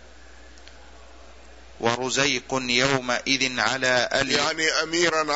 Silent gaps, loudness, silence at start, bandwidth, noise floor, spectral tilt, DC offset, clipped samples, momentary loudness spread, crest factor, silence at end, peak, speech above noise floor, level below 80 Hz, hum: none; -22 LUFS; 0.05 s; 8 kHz; -48 dBFS; -2.5 dB/octave; 0.3%; under 0.1%; 4 LU; 20 dB; 0 s; -4 dBFS; 25 dB; -52 dBFS; none